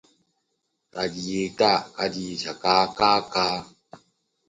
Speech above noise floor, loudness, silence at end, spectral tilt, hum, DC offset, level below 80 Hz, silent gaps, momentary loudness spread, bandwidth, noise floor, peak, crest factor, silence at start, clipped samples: 52 dB; -24 LUFS; 0.5 s; -4 dB/octave; none; under 0.1%; -60 dBFS; none; 10 LU; 9.8 kHz; -76 dBFS; -4 dBFS; 22 dB; 0.95 s; under 0.1%